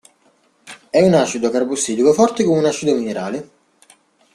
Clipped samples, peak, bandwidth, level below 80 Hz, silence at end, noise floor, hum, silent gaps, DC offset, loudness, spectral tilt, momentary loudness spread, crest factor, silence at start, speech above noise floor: under 0.1%; -2 dBFS; 13 kHz; -58 dBFS; 0.9 s; -58 dBFS; none; none; under 0.1%; -17 LUFS; -5 dB/octave; 10 LU; 16 dB; 0.65 s; 42 dB